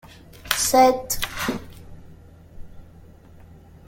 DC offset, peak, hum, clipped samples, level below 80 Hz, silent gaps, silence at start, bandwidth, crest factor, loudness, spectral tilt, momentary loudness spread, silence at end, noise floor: under 0.1%; -2 dBFS; none; under 0.1%; -46 dBFS; none; 0.35 s; 17 kHz; 24 dB; -21 LUFS; -2.5 dB/octave; 23 LU; 1.05 s; -47 dBFS